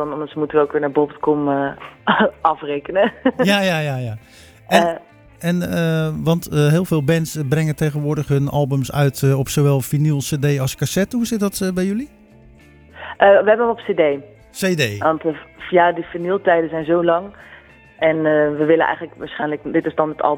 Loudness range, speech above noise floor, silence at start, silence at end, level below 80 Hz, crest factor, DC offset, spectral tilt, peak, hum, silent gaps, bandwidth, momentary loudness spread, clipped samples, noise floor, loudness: 2 LU; 28 dB; 0 s; 0 s; -48 dBFS; 18 dB; under 0.1%; -6 dB/octave; 0 dBFS; none; none; over 20 kHz; 9 LU; under 0.1%; -46 dBFS; -18 LUFS